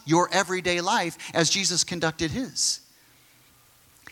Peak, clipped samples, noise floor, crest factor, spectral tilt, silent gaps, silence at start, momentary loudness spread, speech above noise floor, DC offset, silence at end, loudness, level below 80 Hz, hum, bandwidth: -4 dBFS; under 0.1%; -57 dBFS; 22 dB; -2.5 dB/octave; none; 0.05 s; 7 LU; 33 dB; under 0.1%; 1.35 s; -24 LUFS; -58 dBFS; none; 17.5 kHz